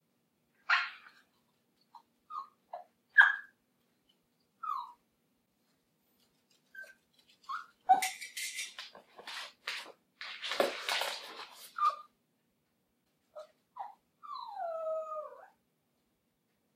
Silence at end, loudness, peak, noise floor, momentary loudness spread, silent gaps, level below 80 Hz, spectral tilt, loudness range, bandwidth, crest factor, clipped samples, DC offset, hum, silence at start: 1.3 s; -33 LUFS; -8 dBFS; -79 dBFS; 23 LU; none; under -90 dBFS; 0.5 dB/octave; 15 LU; 15.5 kHz; 30 dB; under 0.1%; under 0.1%; none; 0.7 s